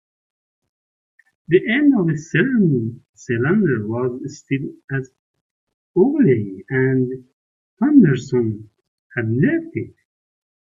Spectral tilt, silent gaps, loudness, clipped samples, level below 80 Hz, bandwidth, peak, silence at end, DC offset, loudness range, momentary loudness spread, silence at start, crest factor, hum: -8 dB/octave; 3.09-3.13 s, 4.84-4.88 s, 5.19-5.34 s, 5.41-5.67 s, 5.74-5.94 s, 7.33-7.77 s, 8.88-9.10 s; -19 LUFS; under 0.1%; -60 dBFS; 7.6 kHz; -2 dBFS; 0.9 s; under 0.1%; 3 LU; 15 LU; 1.5 s; 18 dB; none